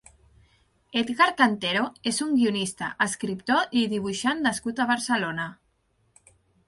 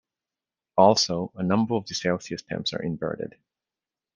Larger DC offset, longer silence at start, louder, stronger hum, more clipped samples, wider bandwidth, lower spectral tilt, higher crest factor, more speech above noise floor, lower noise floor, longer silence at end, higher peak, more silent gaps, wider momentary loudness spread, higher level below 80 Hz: neither; first, 0.95 s vs 0.75 s; about the same, -25 LUFS vs -25 LUFS; neither; neither; first, 11.5 kHz vs 10 kHz; about the same, -3.5 dB/octave vs -4.5 dB/octave; about the same, 22 dB vs 22 dB; second, 44 dB vs over 66 dB; second, -69 dBFS vs under -90 dBFS; first, 1.15 s vs 0.85 s; about the same, -6 dBFS vs -4 dBFS; neither; second, 9 LU vs 13 LU; about the same, -64 dBFS vs -64 dBFS